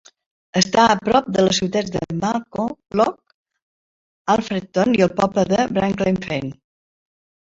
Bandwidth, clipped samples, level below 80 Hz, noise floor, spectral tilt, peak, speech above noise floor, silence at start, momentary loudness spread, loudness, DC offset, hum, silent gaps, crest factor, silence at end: 7.8 kHz; under 0.1%; -50 dBFS; under -90 dBFS; -5 dB/octave; -2 dBFS; over 71 dB; 0.55 s; 10 LU; -19 LUFS; under 0.1%; none; 3.34-3.45 s, 3.62-4.25 s; 20 dB; 1.05 s